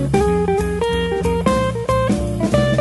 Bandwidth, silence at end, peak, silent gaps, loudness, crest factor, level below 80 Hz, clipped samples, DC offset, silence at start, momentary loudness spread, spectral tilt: 12 kHz; 0 s; -2 dBFS; none; -18 LUFS; 14 dB; -30 dBFS; under 0.1%; under 0.1%; 0 s; 3 LU; -6.5 dB/octave